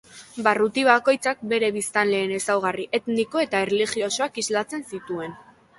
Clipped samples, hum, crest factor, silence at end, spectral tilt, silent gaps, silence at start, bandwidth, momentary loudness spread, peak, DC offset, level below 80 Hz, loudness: under 0.1%; none; 20 dB; 0.4 s; -3 dB/octave; none; 0.15 s; 12 kHz; 13 LU; -2 dBFS; under 0.1%; -66 dBFS; -23 LUFS